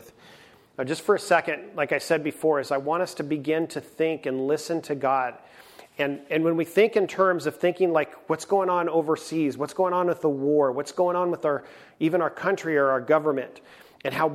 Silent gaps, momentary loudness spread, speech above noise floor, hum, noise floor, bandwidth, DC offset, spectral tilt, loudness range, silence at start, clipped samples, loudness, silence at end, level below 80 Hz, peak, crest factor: none; 7 LU; 28 dB; none; -52 dBFS; 15.5 kHz; under 0.1%; -5.5 dB/octave; 3 LU; 0.05 s; under 0.1%; -25 LUFS; 0 s; -72 dBFS; -6 dBFS; 18 dB